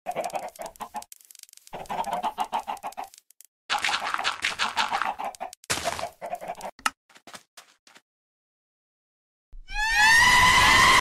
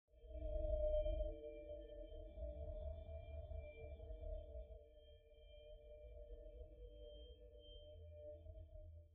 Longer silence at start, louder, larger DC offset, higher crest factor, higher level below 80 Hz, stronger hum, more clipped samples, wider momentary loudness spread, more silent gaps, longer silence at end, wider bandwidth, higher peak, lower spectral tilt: about the same, 0.05 s vs 0.1 s; first, -22 LUFS vs -52 LUFS; neither; about the same, 20 dB vs 20 dB; first, -46 dBFS vs -52 dBFS; neither; neither; first, 23 LU vs 18 LU; first, 3.48-3.69 s, 5.57-5.63 s, 6.72-6.79 s, 6.97-7.09 s, 7.47-7.57 s, 7.79-7.87 s, 8.02-9.52 s vs none; about the same, 0 s vs 0 s; first, 16 kHz vs 3.7 kHz; first, -6 dBFS vs -30 dBFS; second, -1 dB/octave vs -8.5 dB/octave